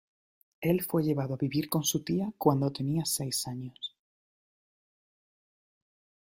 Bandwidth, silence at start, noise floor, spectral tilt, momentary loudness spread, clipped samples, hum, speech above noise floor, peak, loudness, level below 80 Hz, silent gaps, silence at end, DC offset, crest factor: 16 kHz; 0.6 s; under -90 dBFS; -5 dB/octave; 10 LU; under 0.1%; none; over 60 dB; -10 dBFS; -30 LUFS; -66 dBFS; none; 2.45 s; under 0.1%; 22 dB